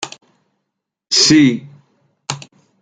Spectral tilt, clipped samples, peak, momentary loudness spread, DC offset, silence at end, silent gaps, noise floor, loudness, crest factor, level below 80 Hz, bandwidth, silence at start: -3 dB/octave; under 0.1%; 0 dBFS; 20 LU; under 0.1%; 0.45 s; none; -77 dBFS; -11 LUFS; 18 dB; -56 dBFS; 9.4 kHz; 0 s